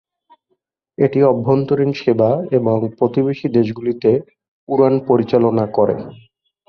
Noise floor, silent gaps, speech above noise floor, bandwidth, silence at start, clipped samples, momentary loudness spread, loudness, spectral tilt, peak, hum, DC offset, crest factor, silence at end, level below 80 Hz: -69 dBFS; 4.48-4.67 s; 54 dB; 6.2 kHz; 1 s; under 0.1%; 5 LU; -16 LUFS; -9.5 dB/octave; -2 dBFS; none; under 0.1%; 16 dB; 0.55 s; -56 dBFS